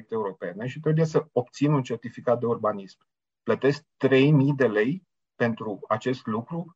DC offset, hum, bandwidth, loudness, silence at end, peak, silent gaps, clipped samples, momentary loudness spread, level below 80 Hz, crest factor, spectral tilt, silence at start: under 0.1%; none; 7.8 kHz; -25 LUFS; 0.05 s; -10 dBFS; none; under 0.1%; 13 LU; -70 dBFS; 16 dB; -7.5 dB/octave; 0.1 s